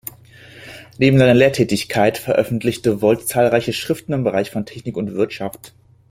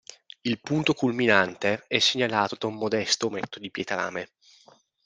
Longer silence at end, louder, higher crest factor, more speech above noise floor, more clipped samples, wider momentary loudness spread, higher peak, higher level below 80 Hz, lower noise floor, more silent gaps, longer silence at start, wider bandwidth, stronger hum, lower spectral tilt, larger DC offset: second, 0.4 s vs 0.8 s; first, -18 LUFS vs -25 LUFS; second, 16 dB vs 24 dB; second, 26 dB vs 32 dB; neither; about the same, 15 LU vs 13 LU; about the same, -2 dBFS vs -2 dBFS; first, -50 dBFS vs -68 dBFS; second, -43 dBFS vs -58 dBFS; neither; about the same, 0.55 s vs 0.45 s; first, 16.5 kHz vs 10 kHz; neither; first, -6 dB/octave vs -3.5 dB/octave; neither